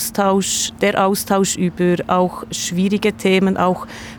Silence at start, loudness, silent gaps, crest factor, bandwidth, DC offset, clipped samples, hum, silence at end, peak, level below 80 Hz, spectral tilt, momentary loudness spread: 0 s; -17 LUFS; none; 14 dB; over 20 kHz; under 0.1%; under 0.1%; none; 0 s; -4 dBFS; -48 dBFS; -4.5 dB/octave; 4 LU